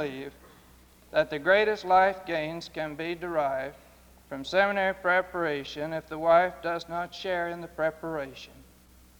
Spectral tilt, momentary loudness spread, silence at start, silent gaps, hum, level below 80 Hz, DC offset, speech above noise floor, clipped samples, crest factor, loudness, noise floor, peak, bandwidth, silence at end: -5 dB/octave; 15 LU; 0 s; none; none; -58 dBFS; under 0.1%; 28 dB; under 0.1%; 20 dB; -28 LUFS; -56 dBFS; -8 dBFS; over 20 kHz; 0.55 s